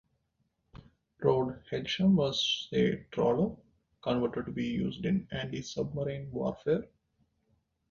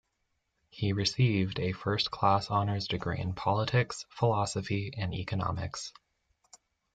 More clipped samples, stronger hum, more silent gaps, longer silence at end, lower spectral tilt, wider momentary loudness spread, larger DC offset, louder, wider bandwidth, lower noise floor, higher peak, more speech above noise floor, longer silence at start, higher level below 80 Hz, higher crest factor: neither; neither; neither; about the same, 1.05 s vs 1.05 s; about the same, -6 dB/octave vs -5.5 dB/octave; about the same, 9 LU vs 8 LU; neither; about the same, -31 LUFS vs -31 LUFS; second, 7.2 kHz vs 9.2 kHz; about the same, -78 dBFS vs -79 dBFS; about the same, -12 dBFS vs -12 dBFS; about the same, 47 dB vs 49 dB; about the same, 0.75 s vs 0.75 s; about the same, -58 dBFS vs -58 dBFS; about the same, 20 dB vs 20 dB